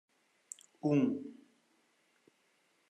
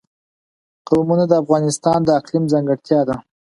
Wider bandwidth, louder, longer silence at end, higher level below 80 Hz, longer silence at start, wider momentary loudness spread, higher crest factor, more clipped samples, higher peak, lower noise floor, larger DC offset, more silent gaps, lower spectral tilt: about the same, 11 kHz vs 11.5 kHz; second, -34 LUFS vs -17 LUFS; first, 1.55 s vs 0.4 s; second, -88 dBFS vs -54 dBFS; about the same, 0.85 s vs 0.9 s; first, 20 LU vs 4 LU; about the same, 20 dB vs 18 dB; neither; second, -20 dBFS vs 0 dBFS; second, -74 dBFS vs under -90 dBFS; neither; neither; about the same, -7 dB/octave vs -6.5 dB/octave